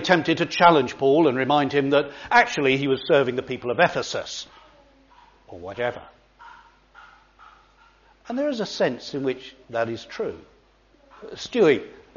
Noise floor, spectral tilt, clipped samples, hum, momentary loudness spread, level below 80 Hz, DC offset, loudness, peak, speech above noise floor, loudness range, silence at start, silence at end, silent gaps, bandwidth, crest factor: -58 dBFS; -3 dB/octave; under 0.1%; none; 15 LU; -60 dBFS; under 0.1%; -22 LUFS; -2 dBFS; 36 dB; 17 LU; 0 s; 0.25 s; none; 7.2 kHz; 22 dB